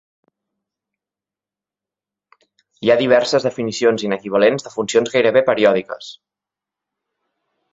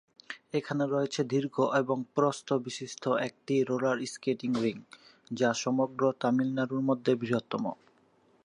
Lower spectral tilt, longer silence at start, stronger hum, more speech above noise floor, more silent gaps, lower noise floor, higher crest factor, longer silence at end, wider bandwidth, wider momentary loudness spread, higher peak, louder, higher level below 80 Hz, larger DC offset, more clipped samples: about the same, -4.5 dB/octave vs -5.5 dB/octave; first, 2.8 s vs 0.3 s; first, 50 Hz at -50 dBFS vs none; first, 73 dB vs 36 dB; neither; first, -89 dBFS vs -66 dBFS; about the same, 20 dB vs 18 dB; first, 1.6 s vs 0.7 s; second, 8 kHz vs 11 kHz; about the same, 9 LU vs 7 LU; first, 0 dBFS vs -12 dBFS; first, -17 LUFS vs -30 LUFS; first, -62 dBFS vs -76 dBFS; neither; neither